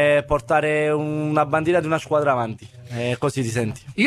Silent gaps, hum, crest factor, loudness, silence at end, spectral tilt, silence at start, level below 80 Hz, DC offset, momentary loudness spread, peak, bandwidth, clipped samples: none; none; 16 dB; -21 LUFS; 0 s; -6 dB/octave; 0 s; -46 dBFS; under 0.1%; 9 LU; -4 dBFS; 14 kHz; under 0.1%